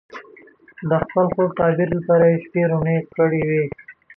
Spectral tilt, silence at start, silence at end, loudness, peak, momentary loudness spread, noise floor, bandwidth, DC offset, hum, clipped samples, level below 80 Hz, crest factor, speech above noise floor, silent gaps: -11 dB/octave; 0.15 s; 0.25 s; -19 LUFS; -4 dBFS; 14 LU; -48 dBFS; 3.7 kHz; under 0.1%; none; under 0.1%; -52 dBFS; 14 dB; 29 dB; none